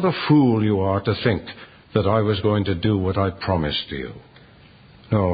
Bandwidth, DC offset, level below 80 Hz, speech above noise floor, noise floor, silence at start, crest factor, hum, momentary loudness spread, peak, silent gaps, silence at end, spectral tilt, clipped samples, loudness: 5 kHz; under 0.1%; -40 dBFS; 28 dB; -48 dBFS; 0 s; 18 dB; none; 13 LU; -4 dBFS; none; 0 s; -12 dB/octave; under 0.1%; -21 LUFS